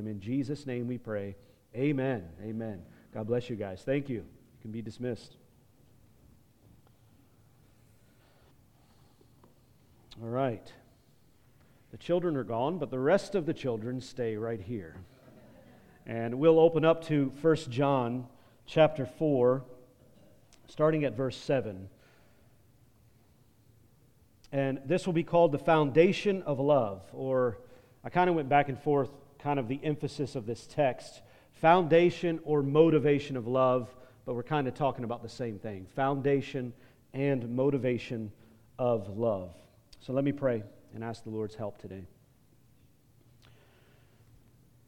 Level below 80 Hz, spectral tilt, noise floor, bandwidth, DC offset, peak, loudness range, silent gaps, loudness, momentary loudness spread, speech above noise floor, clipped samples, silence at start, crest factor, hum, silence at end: -64 dBFS; -7.5 dB/octave; -64 dBFS; 11 kHz; under 0.1%; -8 dBFS; 14 LU; none; -30 LUFS; 17 LU; 35 dB; under 0.1%; 0 s; 22 dB; none; 2.8 s